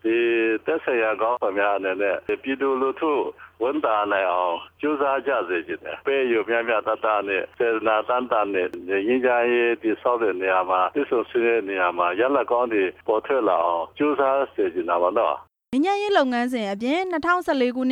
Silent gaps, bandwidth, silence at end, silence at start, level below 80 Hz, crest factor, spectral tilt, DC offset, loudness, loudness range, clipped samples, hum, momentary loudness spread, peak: none; 10.5 kHz; 0 s; 0.05 s; -64 dBFS; 14 dB; -5.5 dB/octave; under 0.1%; -23 LUFS; 2 LU; under 0.1%; none; 5 LU; -8 dBFS